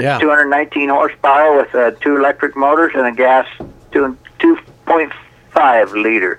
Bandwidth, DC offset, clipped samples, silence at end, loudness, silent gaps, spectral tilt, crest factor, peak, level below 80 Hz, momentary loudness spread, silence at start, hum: 10.5 kHz; under 0.1%; under 0.1%; 0.05 s; -13 LUFS; none; -6.5 dB/octave; 14 dB; 0 dBFS; -52 dBFS; 8 LU; 0 s; none